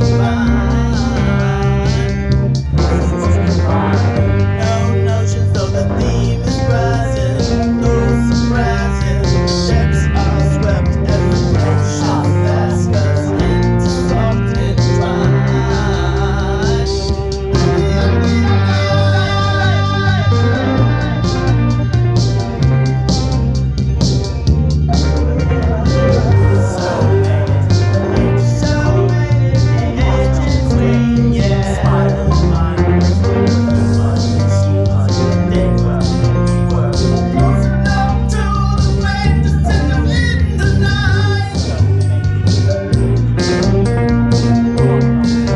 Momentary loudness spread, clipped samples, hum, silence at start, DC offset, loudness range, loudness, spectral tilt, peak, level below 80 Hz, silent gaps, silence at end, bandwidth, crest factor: 3 LU; under 0.1%; none; 0 s; under 0.1%; 1 LU; -14 LUFS; -7 dB/octave; -2 dBFS; -22 dBFS; none; 0 s; 10.5 kHz; 12 dB